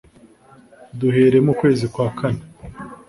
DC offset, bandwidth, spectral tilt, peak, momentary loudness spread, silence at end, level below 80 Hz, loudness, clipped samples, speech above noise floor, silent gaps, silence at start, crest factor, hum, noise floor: under 0.1%; 11.5 kHz; -8 dB/octave; -4 dBFS; 22 LU; 0.15 s; -48 dBFS; -18 LUFS; under 0.1%; 32 dB; none; 0.95 s; 16 dB; none; -49 dBFS